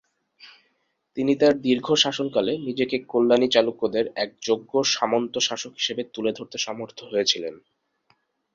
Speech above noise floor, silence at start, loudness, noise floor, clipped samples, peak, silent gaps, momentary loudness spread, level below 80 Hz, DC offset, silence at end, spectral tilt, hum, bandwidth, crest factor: 48 dB; 0.45 s; -23 LUFS; -71 dBFS; under 0.1%; -4 dBFS; none; 9 LU; -68 dBFS; under 0.1%; 1 s; -3 dB/octave; none; 7.6 kHz; 20 dB